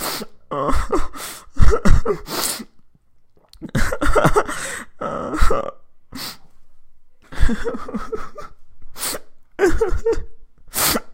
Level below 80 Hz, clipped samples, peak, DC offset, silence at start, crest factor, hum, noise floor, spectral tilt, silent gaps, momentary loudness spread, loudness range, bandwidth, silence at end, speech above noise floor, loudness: -24 dBFS; under 0.1%; 0 dBFS; under 0.1%; 0 s; 18 dB; none; -50 dBFS; -4.5 dB/octave; none; 19 LU; 7 LU; 16 kHz; 0 s; 31 dB; -22 LUFS